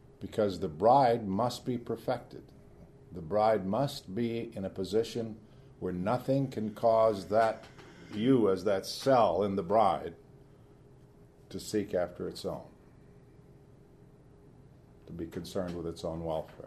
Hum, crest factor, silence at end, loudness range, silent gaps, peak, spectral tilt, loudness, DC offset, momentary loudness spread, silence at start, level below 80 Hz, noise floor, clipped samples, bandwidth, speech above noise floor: none; 20 dB; 0 s; 13 LU; none; -12 dBFS; -6.5 dB/octave; -31 LUFS; under 0.1%; 17 LU; 0.2 s; -60 dBFS; -57 dBFS; under 0.1%; 13.5 kHz; 27 dB